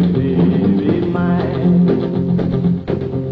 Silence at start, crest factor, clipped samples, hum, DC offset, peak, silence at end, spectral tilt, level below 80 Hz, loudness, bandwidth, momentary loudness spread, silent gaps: 0 s; 12 dB; under 0.1%; none; under 0.1%; -4 dBFS; 0 s; -11 dB/octave; -40 dBFS; -16 LUFS; 4.9 kHz; 4 LU; none